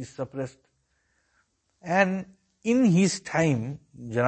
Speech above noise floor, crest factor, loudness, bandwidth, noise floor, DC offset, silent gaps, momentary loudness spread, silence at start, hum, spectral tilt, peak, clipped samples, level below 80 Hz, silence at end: 46 dB; 20 dB; -25 LUFS; 8.8 kHz; -71 dBFS; under 0.1%; none; 17 LU; 0 s; none; -6 dB/octave; -6 dBFS; under 0.1%; -64 dBFS; 0 s